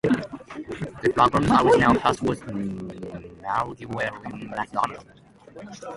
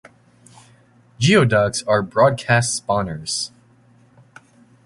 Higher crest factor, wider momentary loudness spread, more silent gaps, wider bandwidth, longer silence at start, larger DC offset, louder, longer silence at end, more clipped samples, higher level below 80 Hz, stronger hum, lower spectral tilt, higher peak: about the same, 22 dB vs 20 dB; first, 20 LU vs 9 LU; neither; about the same, 11.5 kHz vs 11.5 kHz; second, 0.05 s vs 1.2 s; neither; second, -23 LUFS vs -18 LUFS; second, 0 s vs 1.4 s; neither; about the same, -48 dBFS vs -50 dBFS; neither; first, -6 dB/octave vs -4.5 dB/octave; about the same, -2 dBFS vs -2 dBFS